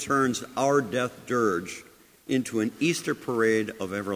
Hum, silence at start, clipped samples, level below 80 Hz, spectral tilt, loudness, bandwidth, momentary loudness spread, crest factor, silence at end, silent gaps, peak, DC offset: none; 0 s; under 0.1%; -62 dBFS; -4.5 dB/octave; -27 LUFS; 16 kHz; 8 LU; 16 dB; 0 s; none; -10 dBFS; under 0.1%